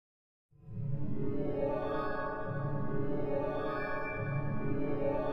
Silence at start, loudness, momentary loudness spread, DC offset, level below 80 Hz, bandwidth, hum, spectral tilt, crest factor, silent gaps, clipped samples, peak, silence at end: 0.5 s; -36 LUFS; 3 LU; under 0.1%; -48 dBFS; 5.6 kHz; none; -10 dB/octave; 14 dB; none; under 0.1%; -20 dBFS; 0 s